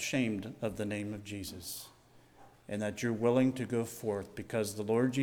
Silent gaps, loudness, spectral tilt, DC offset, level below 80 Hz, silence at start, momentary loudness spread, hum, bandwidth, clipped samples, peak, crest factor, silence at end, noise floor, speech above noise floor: none; -35 LUFS; -5.5 dB/octave; under 0.1%; -66 dBFS; 0 s; 12 LU; none; 19.5 kHz; under 0.1%; -16 dBFS; 18 dB; 0 s; -60 dBFS; 27 dB